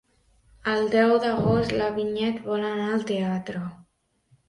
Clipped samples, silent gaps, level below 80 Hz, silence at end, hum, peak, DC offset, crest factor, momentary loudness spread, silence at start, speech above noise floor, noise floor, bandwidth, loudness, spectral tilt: under 0.1%; none; -54 dBFS; 0.65 s; none; -8 dBFS; under 0.1%; 18 dB; 11 LU; 0.65 s; 43 dB; -67 dBFS; 11.5 kHz; -25 LUFS; -7 dB/octave